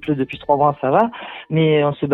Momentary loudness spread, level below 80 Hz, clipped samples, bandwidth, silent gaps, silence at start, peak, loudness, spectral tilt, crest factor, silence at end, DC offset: 7 LU; -54 dBFS; under 0.1%; 4.1 kHz; none; 0 s; -2 dBFS; -18 LUFS; -9.5 dB/octave; 16 dB; 0 s; under 0.1%